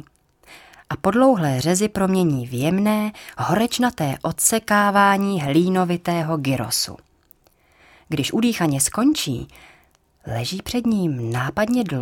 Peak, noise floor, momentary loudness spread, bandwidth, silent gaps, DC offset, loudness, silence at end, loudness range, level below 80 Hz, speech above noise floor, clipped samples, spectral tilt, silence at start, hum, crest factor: -2 dBFS; -58 dBFS; 10 LU; 18.5 kHz; none; under 0.1%; -20 LUFS; 0 s; 4 LU; -50 dBFS; 38 dB; under 0.1%; -4.5 dB/octave; 0.5 s; none; 18 dB